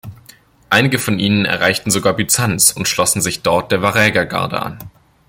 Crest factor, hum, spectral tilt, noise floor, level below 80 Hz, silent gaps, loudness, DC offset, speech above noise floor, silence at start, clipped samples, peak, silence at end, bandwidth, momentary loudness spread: 16 dB; none; -3 dB/octave; -46 dBFS; -48 dBFS; none; -14 LUFS; under 0.1%; 31 dB; 0.05 s; under 0.1%; 0 dBFS; 0.4 s; 17 kHz; 7 LU